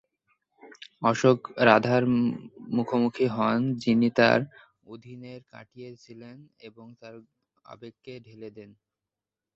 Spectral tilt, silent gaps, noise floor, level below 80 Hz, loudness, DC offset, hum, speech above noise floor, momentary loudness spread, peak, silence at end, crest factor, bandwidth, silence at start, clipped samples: -6.5 dB/octave; none; -89 dBFS; -66 dBFS; -24 LUFS; under 0.1%; none; 63 dB; 25 LU; -4 dBFS; 0.9 s; 24 dB; 7.6 kHz; 0.65 s; under 0.1%